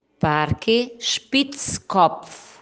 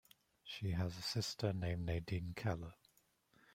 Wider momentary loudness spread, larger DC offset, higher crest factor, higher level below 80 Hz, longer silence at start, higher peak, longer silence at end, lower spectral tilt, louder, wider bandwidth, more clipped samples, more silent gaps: about the same, 9 LU vs 9 LU; neither; about the same, 18 dB vs 20 dB; first, -50 dBFS vs -62 dBFS; second, 0.2 s vs 0.45 s; first, -4 dBFS vs -24 dBFS; second, 0.2 s vs 0.8 s; second, -4 dB/octave vs -5.5 dB/octave; first, -21 LUFS vs -42 LUFS; second, 10.5 kHz vs 16 kHz; neither; neither